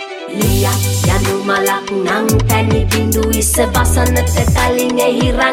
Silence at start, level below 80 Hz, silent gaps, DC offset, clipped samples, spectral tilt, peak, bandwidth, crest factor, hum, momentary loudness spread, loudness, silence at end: 0 s; -22 dBFS; none; under 0.1%; under 0.1%; -4.5 dB/octave; 0 dBFS; 17.5 kHz; 12 dB; none; 3 LU; -14 LUFS; 0 s